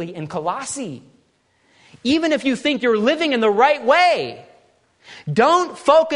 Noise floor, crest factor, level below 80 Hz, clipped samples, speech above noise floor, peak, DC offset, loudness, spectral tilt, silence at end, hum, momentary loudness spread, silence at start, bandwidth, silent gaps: -62 dBFS; 18 dB; -64 dBFS; under 0.1%; 44 dB; 0 dBFS; under 0.1%; -18 LUFS; -4.5 dB/octave; 0 s; none; 14 LU; 0 s; 11 kHz; none